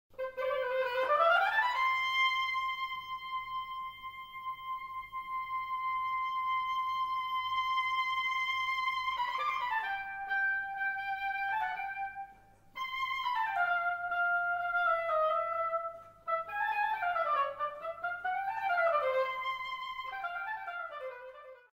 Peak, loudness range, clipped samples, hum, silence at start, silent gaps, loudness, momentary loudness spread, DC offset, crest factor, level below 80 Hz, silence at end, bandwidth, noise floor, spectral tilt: -16 dBFS; 5 LU; under 0.1%; none; 0.2 s; none; -33 LUFS; 12 LU; under 0.1%; 18 dB; -68 dBFS; 0.2 s; 16 kHz; -58 dBFS; -1.5 dB/octave